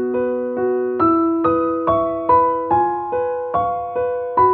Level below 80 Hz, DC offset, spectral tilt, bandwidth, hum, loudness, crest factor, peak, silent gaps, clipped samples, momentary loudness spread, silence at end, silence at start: -48 dBFS; under 0.1%; -11 dB/octave; 4.3 kHz; none; -18 LUFS; 14 dB; -4 dBFS; none; under 0.1%; 6 LU; 0 s; 0 s